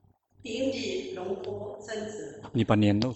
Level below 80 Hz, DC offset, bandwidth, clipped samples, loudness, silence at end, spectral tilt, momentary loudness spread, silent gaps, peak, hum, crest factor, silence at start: -58 dBFS; under 0.1%; 8.4 kHz; under 0.1%; -30 LUFS; 0 s; -6.5 dB/octave; 15 LU; none; -8 dBFS; none; 22 dB; 0.45 s